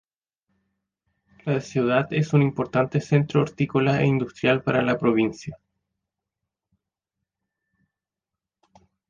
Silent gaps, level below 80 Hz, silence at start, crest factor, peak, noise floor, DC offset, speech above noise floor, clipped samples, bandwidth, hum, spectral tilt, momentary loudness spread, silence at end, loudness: none; -60 dBFS; 1.45 s; 20 dB; -6 dBFS; -88 dBFS; under 0.1%; 66 dB; under 0.1%; 7.4 kHz; none; -7.5 dB/octave; 7 LU; 3.55 s; -22 LUFS